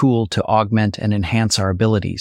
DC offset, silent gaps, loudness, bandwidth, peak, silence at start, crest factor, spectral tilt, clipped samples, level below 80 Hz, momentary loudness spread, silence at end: under 0.1%; none; -18 LUFS; 13 kHz; -2 dBFS; 0 s; 14 dB; -5.5 dB/octave; under 0.1%; -42 dBFS; 3 LU; 0 s